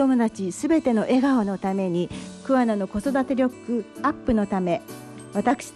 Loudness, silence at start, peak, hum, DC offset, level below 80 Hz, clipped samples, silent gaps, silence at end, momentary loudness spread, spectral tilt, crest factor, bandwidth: -24 LUFS; 0 s; -8 dBFS; none; under 0.1%; -50 dBFS; under 0.1%; none; 0.05 s; 8 LU; -6.5 dB/octave; 14 dB; 12.5 kHz